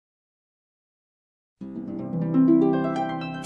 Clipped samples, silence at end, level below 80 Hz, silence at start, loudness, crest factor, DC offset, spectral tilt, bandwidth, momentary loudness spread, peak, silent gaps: under 0.1%; 0 s; -64 dBFS; 1.6 s; -23 LUFS; 18 dB; under 0.1%; -9 dB/octave; 6 kHz; 18 LU; -8 dBFS; none